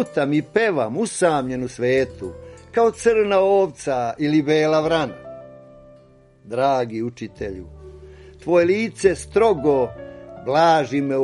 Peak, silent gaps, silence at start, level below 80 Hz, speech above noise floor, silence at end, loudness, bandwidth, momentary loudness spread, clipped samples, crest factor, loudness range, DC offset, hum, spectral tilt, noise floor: -4 dBFS; none; 0 s; -48 dBFS; 31 dB; 0 s; -20 LUFS; 11.5 kHz; 17 LU; under 0.1%; 18 dB; 6 LU; under 0.1%; none; -5.5 dB/octave; -51 dBFS